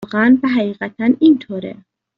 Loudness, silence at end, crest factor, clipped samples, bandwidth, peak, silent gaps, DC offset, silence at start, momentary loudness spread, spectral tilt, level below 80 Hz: -15 LUFS; 0.45 s; 14 dB; under 0.1%; 5.4 kHz; -2 dBFS; none; under 0.1%; 0 s; 15 LU; -5 dB/octave; -58 dBFS